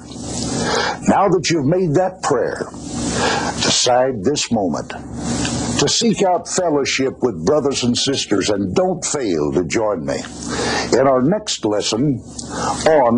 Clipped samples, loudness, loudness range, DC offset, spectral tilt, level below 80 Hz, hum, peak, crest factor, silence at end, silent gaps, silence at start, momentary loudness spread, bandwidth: under 0.1%; -18 LUFS; 1 LU; under 0.1%; -4 dB/octave; -42 dBFS; none; -4 dBFS; 14 dB; 0 s; none; 0 s; 9 LU; 10.5 kHz